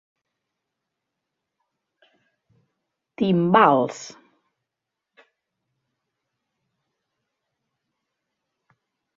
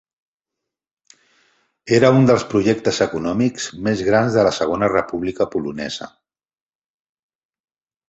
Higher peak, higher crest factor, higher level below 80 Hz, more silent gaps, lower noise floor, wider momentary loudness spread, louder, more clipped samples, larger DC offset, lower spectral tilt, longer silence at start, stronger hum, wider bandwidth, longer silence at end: about the same, -2 dBFS vs -2 dBFS; first, 26 dB vs 18 dB; second, -72 dBFS vs -52 dBFS; neither; about the same, -85 dBFS vs -84 dBFS; first, 21 LU vs 12 LU; about the same, -19 LUFS vs -18 LUFS; neither; neither; about the same, -6.5 dB/octave vs -6 dB/octave; first, 3.2 s vs 1.85 s; neither; about the same, 7.8 kHz vs 8.2 kHz; first, 5.1 s vs 2 s